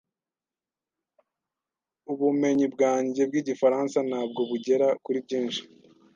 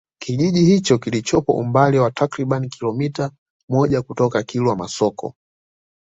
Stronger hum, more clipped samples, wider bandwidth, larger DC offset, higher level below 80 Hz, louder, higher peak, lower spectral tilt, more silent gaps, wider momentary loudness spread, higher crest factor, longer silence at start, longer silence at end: neither; neither; about the same, 7.6 kHz vs 8 kHz; neither; second, -78 dBFS vs -52 dBFS; second, -26 LUFS vs -19 LUFS; second, -10 dBFS vs -2 dBFS; second, -5 dB/octave vs -6.5 dB/octave; second, none vs 3.38-3.68 s; second, 6 LU vs 9 LU; about the same, 18 dB vs 18 dB; first, 2.1 s vs 0.2 s; second, 0.5 s vs 0.8 s